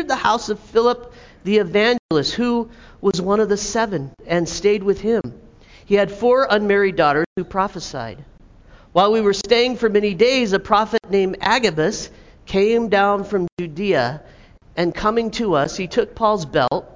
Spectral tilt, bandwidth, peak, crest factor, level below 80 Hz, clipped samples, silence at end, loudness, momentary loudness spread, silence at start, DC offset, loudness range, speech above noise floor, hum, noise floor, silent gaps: -4.5 dB/octave; 7.6 kHz; 0 dBFS; 18 dB; -46 dBFS; under 0.1%; 0.05 s; -19 LUFS; 8 LU; 0 s; under 0.1%; 3 LU; 28 dB; none; -46 dBFS; 1.99-2.09 s, 7.26-7.36 s, 13.52-13.57 s